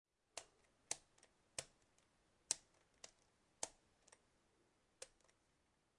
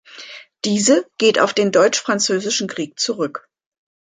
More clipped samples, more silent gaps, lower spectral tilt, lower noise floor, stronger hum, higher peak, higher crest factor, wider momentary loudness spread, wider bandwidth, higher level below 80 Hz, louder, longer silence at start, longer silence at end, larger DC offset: neither; neither; second, 0.5 dB/octave vs -3 dB/octave; first, -82 dBFS vs -39 dBFS; neither; second, -18 dBFS vs -2 dBFS; first, 40 dB vs 18 dB; about the same, 17 LU vs 17 LU; first, 12 kHz vs 9.6 kHz; second, -84 dBFS vs -66 dBFS; second, -50 LUFS vs -17 LUFS; first, 0.35 s vs 0.15 s; first, 0.9 s vs 0.75 s; neither